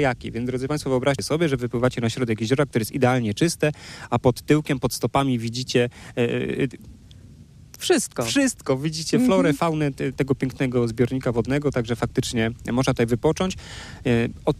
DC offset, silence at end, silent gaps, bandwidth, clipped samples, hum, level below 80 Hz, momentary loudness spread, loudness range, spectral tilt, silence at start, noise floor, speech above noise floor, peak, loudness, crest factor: under 0.1%; 0 s; none; 15.5 kHz; under 0.1%; none; -46 dBFS; 5 LU; 2 LU; -5.5 dB/octave; 0 s; -46 dBFS; 23 dB; -6 dBFS; -23 LUFS; 16 dB